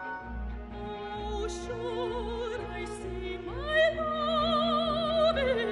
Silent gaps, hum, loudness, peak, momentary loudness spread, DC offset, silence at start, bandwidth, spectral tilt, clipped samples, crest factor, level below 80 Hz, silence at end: none; none; -31 LUFS; -14 dBFS; 13 LU; under 0.1%; 0 s; 11.5 kHz; -5 dB/octave; under 0.1%; 16 dB; -44 dBFS; 0 s